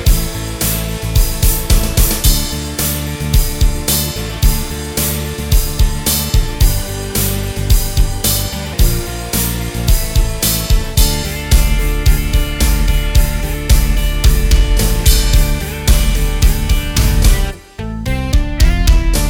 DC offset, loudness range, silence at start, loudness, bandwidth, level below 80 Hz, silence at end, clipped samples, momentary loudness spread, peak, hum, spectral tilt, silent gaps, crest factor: under 0.1%; 2 LU; 0 s; -15 LUFS; 17 kHz; -14 dBFS; 0 s; under 0.1%; 6 LU; 0 dBFS; none; -4 dB/octave; none; 12 dB